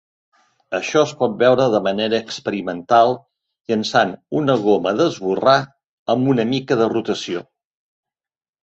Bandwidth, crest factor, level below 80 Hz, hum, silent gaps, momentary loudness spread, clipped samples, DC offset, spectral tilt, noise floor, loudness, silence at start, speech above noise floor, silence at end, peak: 8.2 kHz; 18 dB; -60 dBFS; none; 5.84-6.06 s; 10 LU; under 0.1%; under 0.1%; -5.5 dB/octave; under -90 dBFS; -18 LUFS; 0.7 s; over 72 dB; 1.2 s; -2 dBFS